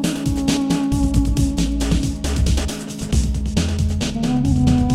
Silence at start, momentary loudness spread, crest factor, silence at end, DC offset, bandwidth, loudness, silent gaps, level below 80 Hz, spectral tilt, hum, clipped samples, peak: 0 s; 4 LU; 14 dB; 0 s; under 0.1%; 15 kHz; -20 LUFS; none; -24 dBFS; -5.5 dB/octave; none; under 0.1%; -4 dBFS